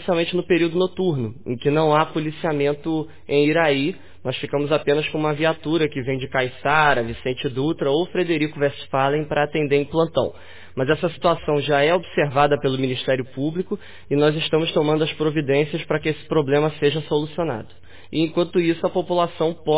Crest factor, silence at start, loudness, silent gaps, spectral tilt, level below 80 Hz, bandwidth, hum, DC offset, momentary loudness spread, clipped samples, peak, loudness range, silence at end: 18 dB; 0 s; -21 LUFS; none; -10.5 dB/octave; -52 dBFS; 4 kHz; none; 1%; 8 LU; under 0.1%; -4 dBFS; 1 LU; 0 s